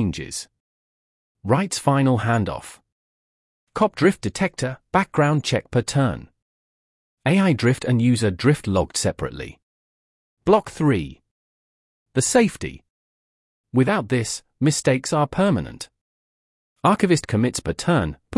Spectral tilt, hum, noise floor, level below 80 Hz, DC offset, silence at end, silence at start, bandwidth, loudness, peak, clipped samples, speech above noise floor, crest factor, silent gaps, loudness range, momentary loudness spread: -5.5 dB/octave; none; under -90 dBFS; -50 dBFS; under 0.1%; 0 s; 0 s; 12 kHz; -21 LUFS; -4 dBFS; under 0.1%; over 70 dB; 18 dB; 0.60-1.35 s, 2.92-3.67 s, 6.42-7.17 s, 9.63-10.37 s, 11.31-12.06 s, 12.90-13.64 s, 16.01-16.76 s; 3 LU; 14 LU